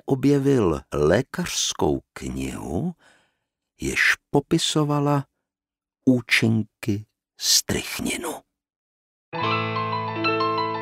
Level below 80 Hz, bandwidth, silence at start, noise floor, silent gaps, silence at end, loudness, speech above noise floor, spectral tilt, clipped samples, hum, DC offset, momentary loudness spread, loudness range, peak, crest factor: -46 dBFS; 16 kHz; 0.05 s; under -90 dBFS; 8.76-9.32 s; 0 s; -23 LUFS; over 68 dB; -4 dB/octave; under 0.1%; none; under 0.1%; 12 LU; 3 LU; -4 dBFS; 20 dB